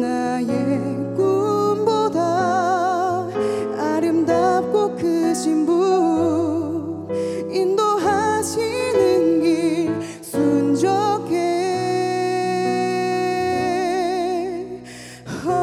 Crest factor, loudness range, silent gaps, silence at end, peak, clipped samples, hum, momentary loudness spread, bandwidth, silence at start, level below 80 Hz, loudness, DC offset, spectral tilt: 14 dB; 2 LU; none; 0 s; -6 dBFS; under 0.1%; none; 7 LU; 13.5 kHz; 0 s; -60 dBFS; -20 LUFS; under 0.1%; -5.5 dB/octave